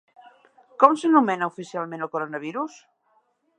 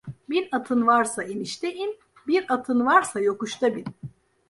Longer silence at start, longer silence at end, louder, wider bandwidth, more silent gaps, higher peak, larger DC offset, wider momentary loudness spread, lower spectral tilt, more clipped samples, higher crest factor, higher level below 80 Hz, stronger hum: first, 0.8 s vs 0.05 s; first, 0.9 s vs 0.4 s; about the same, -23 LUFS vs -24 LUFS; second, 9.6 kHz vs 11.5 kHz; neither; first, 0 dBFS vs -4 dBFS; neither; about the same, 14 LU vs 15 LU; first, -6 dB/octave vs -4 dB/octave; neither; about the same, 24 dB vs 20 dB; second, -78 dBFS vs -66 dBFS; neither